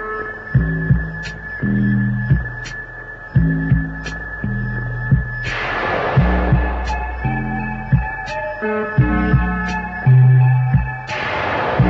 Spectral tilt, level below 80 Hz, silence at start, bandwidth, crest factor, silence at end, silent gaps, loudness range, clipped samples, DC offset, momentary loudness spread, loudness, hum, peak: -8 dB/octave; -26 dBFS; 0 s; 7.2 kHz; 14 dB; 0 s; none; 4 LU; under 0.1%; under 0.1%; 11 LU; -18 LUFS; none; -4 dBFS